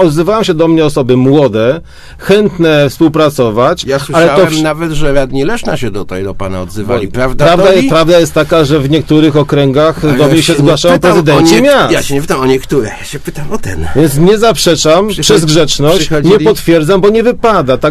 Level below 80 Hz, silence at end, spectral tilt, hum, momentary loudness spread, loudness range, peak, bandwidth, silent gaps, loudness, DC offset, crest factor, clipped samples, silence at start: -28 dBFS; 0 s; -5.5 dB/octave; none; 11 LU; 4 LU; 0 dBFS; 14 kHz; none; -8 LUFS; under 0.1%; 8 dB; 2%; 0 s